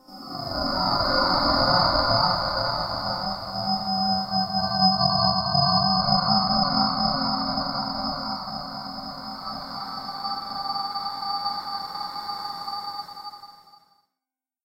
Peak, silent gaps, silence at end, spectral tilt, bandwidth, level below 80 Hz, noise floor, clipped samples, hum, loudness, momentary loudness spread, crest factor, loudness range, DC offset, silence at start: -6 dBFS; none; 1.1 s; -6 dB/octave; 16 kHz; -46 dBFS; -89 dBFS; under 0.1%; none; -24 LUFS; 14 LU; 20 dB; 10 LU; under 0.1%; 0.1 s